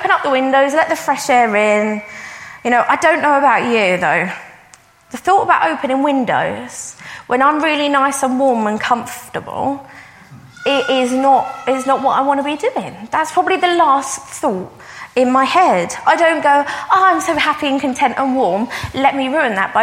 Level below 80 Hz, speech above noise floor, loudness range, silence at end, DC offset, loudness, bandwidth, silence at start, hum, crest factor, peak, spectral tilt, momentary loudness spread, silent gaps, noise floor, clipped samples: -54 dBFS; 32 dB; 4 LU; 0 s; under 0.1%; -15 LUFS; 16.5 kHz; 0 s; none; 14 dB; 0 dBFS; -3.5 dB/octave; 12 LU; none; -46 dBFS; under 0.1%